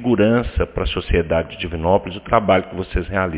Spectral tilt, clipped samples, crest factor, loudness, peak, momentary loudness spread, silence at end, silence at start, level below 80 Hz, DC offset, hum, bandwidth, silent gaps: -10.5 dB/octave; under 0.1%; 18 dB; -19 LUFS; 0 dBFS; 8 LU; 0 s; 0 s; -28 dBFS; under 0.1%; none; 4 kHz; none